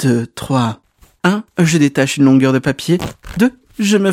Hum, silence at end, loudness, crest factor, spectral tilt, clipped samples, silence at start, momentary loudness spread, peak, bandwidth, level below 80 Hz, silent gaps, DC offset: none; 0 s; -15 LUFS; 14 dB; -5.5 dB/octave; under 0.1%; 0 s; 8 LU; 0 dBFS; 16 kHz; -44 dBFS; none; under 0.1%